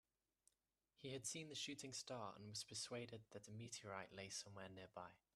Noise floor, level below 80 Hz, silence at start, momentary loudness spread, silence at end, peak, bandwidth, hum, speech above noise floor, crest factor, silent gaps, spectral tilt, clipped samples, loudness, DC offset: under -90 dBFS; -86 dBFS; 1 s; 9 LU; 0.2 s; -34 dBFS; 13.5 kHz; none; over 36 dB; 20 dB; none; -3 dB/octave; under 0.1%; -53 LUFS; under 0.1%